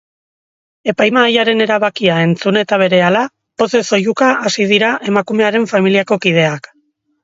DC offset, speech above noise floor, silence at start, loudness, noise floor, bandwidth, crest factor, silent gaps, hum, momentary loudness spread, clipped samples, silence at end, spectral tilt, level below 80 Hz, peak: under 0.1%; 48 dB; 0.85 s; -13 LUFS; -60 dBFS; 8 kHz; 14 dB; none; none; 6 LU; under 0.1%; 0.65 s; -5 dB/octave; -60 dBFS; 0 dBFS